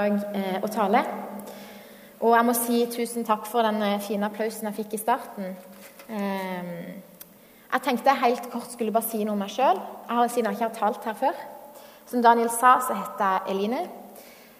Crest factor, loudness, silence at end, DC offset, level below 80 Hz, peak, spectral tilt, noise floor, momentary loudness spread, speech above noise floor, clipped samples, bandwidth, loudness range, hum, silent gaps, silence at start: 22 dB; -25 LUFS; 0.15 s; under 0.1%; -74 dBFS; -4 dBFS; -4.5 dB/octave; -49 dBFS; 20 LU; 25 dB; under 0.1%; 15.5 kHz; 6 LU; none; none; 0 s